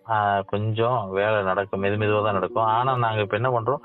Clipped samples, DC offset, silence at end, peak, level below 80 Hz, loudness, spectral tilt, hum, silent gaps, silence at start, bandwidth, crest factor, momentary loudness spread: under 0.1%; under 0.1%; 0.05 s; -8 dBFS; -60 dBFS; -23 LUFS; -10 dB/octave; none; none; 0.05 s; 4.1 kHz; 14 dB; 3 LU